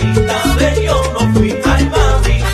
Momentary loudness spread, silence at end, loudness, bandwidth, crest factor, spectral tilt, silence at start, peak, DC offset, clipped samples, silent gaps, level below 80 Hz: 1 LU; 0 s; -13 LUFS; 14 kHz; 12 dB; -5.5 dB/octave; 0 s; 0 dBFS; under 0.1%; under 0.1%; none; -16 dBFS